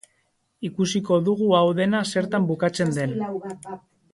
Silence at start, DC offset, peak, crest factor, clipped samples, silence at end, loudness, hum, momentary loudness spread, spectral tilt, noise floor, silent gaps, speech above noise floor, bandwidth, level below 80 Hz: 0.6 s; under 0.1%; -6 dBFS; 18 dB; under 0.1%; 0.35 s; -23 LUFS; none; 16 LU; -6 dB/octave; -69 dBFS; none; 47 dB; 11.5 kHz; -64 dBFS